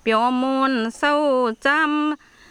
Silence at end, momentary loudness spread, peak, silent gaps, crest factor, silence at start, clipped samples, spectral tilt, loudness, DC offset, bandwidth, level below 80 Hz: 0.35 s; 5 LU; -6 dBFS; none; 14 dB; 0.05 s; under 0.1%; -4 dB/octave; -20 LUFS; under 0.1%; 11.5 kHz; -60 dBFS